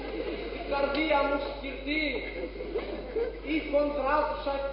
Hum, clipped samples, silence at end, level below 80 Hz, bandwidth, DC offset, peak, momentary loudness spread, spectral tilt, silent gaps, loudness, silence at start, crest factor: none; under 0.1%; 0 s; -44 dBFS; 5.6 kHz; under 0.1%; -14 dBFS; 9 LU; -9 dB/octave; none; -30 LUFS; 0 s; 16 dB